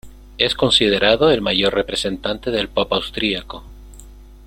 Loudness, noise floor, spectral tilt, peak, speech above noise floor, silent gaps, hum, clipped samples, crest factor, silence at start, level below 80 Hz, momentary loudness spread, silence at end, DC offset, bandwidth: -17 LUFS; -40 dBFS; -4 dB/octave; 0 dBFS; 22 dB; none; none; under 0.1%; 18 dB; 0.05 s; -40 dBFS; 9 LU; 0 s; under 0.1%; 16 kHz